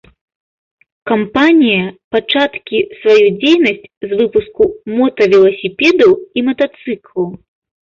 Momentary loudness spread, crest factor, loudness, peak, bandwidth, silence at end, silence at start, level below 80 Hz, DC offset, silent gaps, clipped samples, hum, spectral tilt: 11 LU; 12 dB; -12 LUFS; 0 dBFS; 7.4 kHz; 0.45 s; 1.05 s; -50 dBFS; under 0.1%; 2.04-2.11 s, 3.97-4.01 s; under 0.1%; none; -6 dB/octave